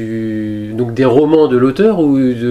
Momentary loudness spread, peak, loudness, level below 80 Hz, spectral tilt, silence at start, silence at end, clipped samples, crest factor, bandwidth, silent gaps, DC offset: 10 LU; 0 dBFS; -12 LUFS; -44 dBFS; -8.5 dB/octave; 0 s; 0 s; under 0.1%; 12 dB; 9.8 kHz; none; under 0.1%